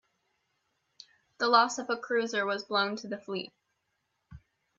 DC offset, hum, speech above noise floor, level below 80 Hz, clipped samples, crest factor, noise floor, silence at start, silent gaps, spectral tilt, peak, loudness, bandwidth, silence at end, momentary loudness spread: under 0.1%; none; 50 dB; -70 dBFS; under 0.1%; 24 dB; -80 dBFS; 1.4 s; none; -3 dB/octave; -8 dBFS; -29 LUFS; 8 kHz; 0.4 s; 14 LU